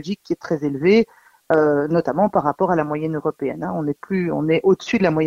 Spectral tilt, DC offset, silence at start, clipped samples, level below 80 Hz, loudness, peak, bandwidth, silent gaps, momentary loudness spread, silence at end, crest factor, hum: -7.5 dB/octave; under 0.1%; 0 s; under 0.1%; -54 dBFS; -20 LUFS; -4 dBFS; 7.6 kHz; none; 8 LU; 0 s; 16 dB; none